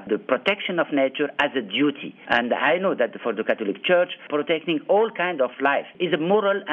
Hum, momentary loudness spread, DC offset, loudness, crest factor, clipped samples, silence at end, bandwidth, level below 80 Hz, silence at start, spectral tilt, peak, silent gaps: none; 4 LU; under 0.1%; -23 LUFS; 16 dB; under 0.1%; 0 s; 6.6 kHz; -68 dBFS; 0 s; -7 dB/octave; -6 dBFS; none